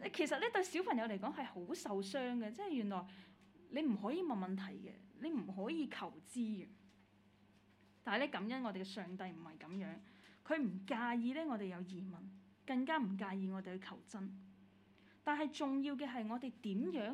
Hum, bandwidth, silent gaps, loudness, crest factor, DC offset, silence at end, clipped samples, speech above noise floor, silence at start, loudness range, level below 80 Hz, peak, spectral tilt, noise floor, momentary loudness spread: none; 13.5 kHz; none; -42 LUFS; 20 dB; under 0.1%; 0 s; under 0.1%; 28 dB; 0 s; 4 LU; -86 dBFS; -22 dBFS; -5.5 dB/octave; -69 dBFS; 12 LU